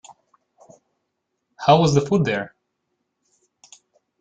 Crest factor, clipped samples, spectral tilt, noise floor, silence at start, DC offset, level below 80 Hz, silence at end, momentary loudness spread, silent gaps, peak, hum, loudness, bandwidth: 22 dB; under 0.1%; -6 dB/octave; -77 dBFS; 1.6 s; under 0.1%; -58 dBFS; 1.75 s; 12 LU; none; -2 dBFS; none; -19 LUFS; 9.2 kHz